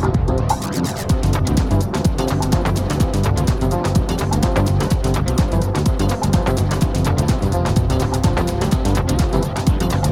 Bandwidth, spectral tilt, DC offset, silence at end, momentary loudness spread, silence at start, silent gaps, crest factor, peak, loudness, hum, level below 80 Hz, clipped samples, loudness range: 16.5 kHz; -6.5 dB/octave; under 0.1%; 0 s; 2 LU; 0 s; none; 14 dB; -2 dBFS; -18 LUFS; none; -24 dBFS; under 0.1%; 0 LU